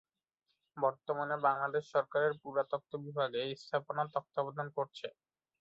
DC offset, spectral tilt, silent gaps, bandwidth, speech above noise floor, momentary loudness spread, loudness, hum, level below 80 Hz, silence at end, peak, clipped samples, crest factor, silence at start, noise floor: under 0.1%; -3 dB/octave; none; 7.8 kHz; 49 dB; 9 LU; -36 LUFS; none; -84 dBFS; 0.5 s; -16 dBFS; under 0.1%; 20 dB; 0.75 s; -84 dBFS